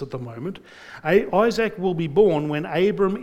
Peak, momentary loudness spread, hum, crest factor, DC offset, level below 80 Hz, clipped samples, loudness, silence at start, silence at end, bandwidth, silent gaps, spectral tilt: -4 dBFS; 15 LU; none; 16 dB; under 0.1%; -52 dBFS; under 0.1%; -21 LUFS; 0 s; 0 s; 14.5 kHz; none; -7 dB/octave